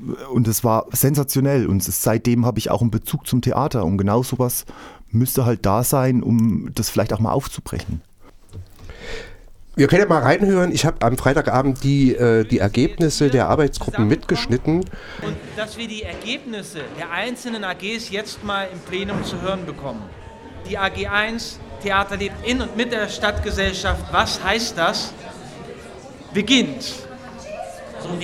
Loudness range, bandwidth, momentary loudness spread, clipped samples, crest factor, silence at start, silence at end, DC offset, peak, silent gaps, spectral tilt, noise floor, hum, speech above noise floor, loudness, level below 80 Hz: 8 LU; 19.5 kHz; 17 LU; under 0.1%; 20 dB; 0 s; 0 s; under 0.1%; -2 dBFS; none; -5 dB/octave; -42 dBFS; none; 23 dB; -20 LUFS; -38 dBFS